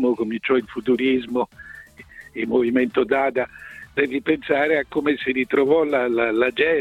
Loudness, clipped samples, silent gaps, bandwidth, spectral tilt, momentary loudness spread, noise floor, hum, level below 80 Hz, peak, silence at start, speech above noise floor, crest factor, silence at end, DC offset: -21 LUFS; under 0.1%; none; 9.8 kHz; -6.5 dB/octave; 11 LU; -44 dBFS; none; -56 dBFS; -4 dBFS; 0 s; 24 dB; 16 dB; 0 s; under 0.1%